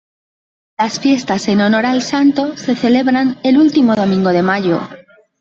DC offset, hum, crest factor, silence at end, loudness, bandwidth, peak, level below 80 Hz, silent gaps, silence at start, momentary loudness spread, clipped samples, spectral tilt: under 0.1%; none; 12 dB; 0.4 s; -14 LUFS; 7.8 kHz; -2 dBFS; -56 dBFS; none; 0.8 s; 7 LU; under 0.1%; -5.5 dB/octave